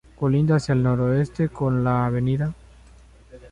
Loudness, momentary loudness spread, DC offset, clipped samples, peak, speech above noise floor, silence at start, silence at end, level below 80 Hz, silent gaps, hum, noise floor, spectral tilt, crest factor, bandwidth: -22 LUFS; 5 LU; under 0.1%; under 0.1%; -8 dBFS; 28 dB; 0.2 s; 0.05 s; -46 dBFS; none; none; -49 dBFS; -8.5 dB/octave; 14 dB; 10 kHz